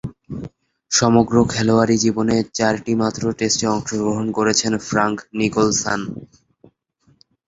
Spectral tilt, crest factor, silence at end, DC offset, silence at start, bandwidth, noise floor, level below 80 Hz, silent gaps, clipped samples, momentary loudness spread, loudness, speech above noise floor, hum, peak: -4 dB/octave; 18 dB; 1.2 s; under 0.1%; 0.05 s; 8 kHz; -60 dBFS; -48 dBFS; none; under 0.1%; 16 LU; -18 LUFS; 42 dB; none; -2 dBFS